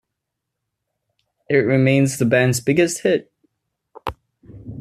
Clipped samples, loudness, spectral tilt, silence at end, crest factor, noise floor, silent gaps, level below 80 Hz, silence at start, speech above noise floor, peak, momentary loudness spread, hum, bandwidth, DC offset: under 0.1%; -18 LUFS; -5.5 dB/octave; 0 s; 18 dB; -80 dBFS; none; -52 dBFS; 1.5 s; 64 dB; -4 dBFS; 16 LU; none; 14 kHz; under 0.1%